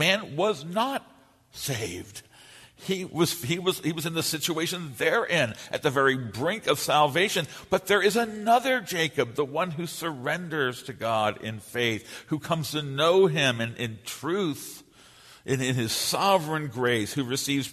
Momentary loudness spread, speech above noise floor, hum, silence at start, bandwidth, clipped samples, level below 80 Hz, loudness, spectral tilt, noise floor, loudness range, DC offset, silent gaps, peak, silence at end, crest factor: 11 LU; 27 dB; none; 0 s; 13.5 kHz; under 0.1%; -64 dBFS; -26 LUFS; -4 dB/octave; -53 dBFS; 5 LU; under 0.1%; none; -8 dBFS; 0 s; 20 dB